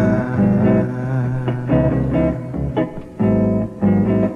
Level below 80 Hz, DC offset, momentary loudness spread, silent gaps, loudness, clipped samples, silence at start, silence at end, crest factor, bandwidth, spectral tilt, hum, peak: -34 dBFS; under 0.1%; 7 LU; none; -18 LUFS; under 0.1%; 0 s; 0 s; 14 dB; 3.9 kHz; -10.5 dB/octave; none; -4 dBFS